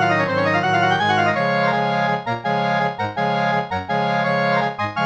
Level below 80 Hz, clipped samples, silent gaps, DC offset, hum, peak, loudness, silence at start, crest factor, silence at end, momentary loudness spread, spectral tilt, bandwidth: -60 dBFS; under 0.1%; none; under 0.1%; none; -6 dBFS; -19 LUFS; 0 s; 14 dB; 0 s; 5 LU; -6 dB/octave; 8.6 kHz